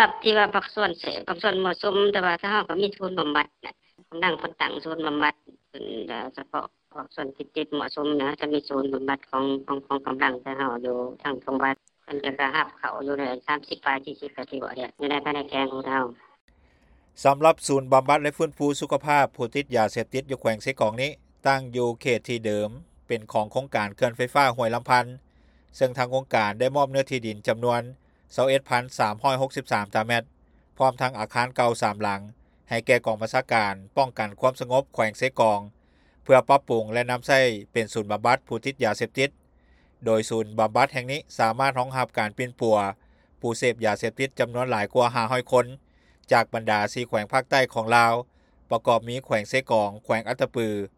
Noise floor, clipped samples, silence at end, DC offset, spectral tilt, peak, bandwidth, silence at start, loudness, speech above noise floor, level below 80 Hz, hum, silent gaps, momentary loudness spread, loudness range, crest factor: -59 dBFS; under 0.1%; 0.1 s; under 0.1%; -4.5 dB/octave; -2 dBFS; 15 kHz; 0 s; -25 LUFS; 35 dB; -62 dBFS; none; 16.41-16.48 s; 10 LU; 6 LU; 22 dB